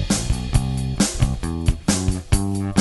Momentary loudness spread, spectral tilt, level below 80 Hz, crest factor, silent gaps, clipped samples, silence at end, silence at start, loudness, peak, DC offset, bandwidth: 3 LU; -5 dB/octave; -26 dBFS; 18 dB; none; under 0.1%; 0 s; 0 s; -22 LUFS; -4 dBFS; under 0.1%; 12 kHz